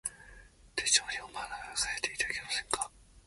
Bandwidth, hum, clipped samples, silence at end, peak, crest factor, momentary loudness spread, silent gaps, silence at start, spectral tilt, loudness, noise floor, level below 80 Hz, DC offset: 12 kHz; none; under 0.1%; 0.05 s; -12 dBFS; 26 dB; 13 LU; none; 0.05 s; 1 dB/octave; -32 LUFS; -56 dBFS; -58 dBFS; under 0.1%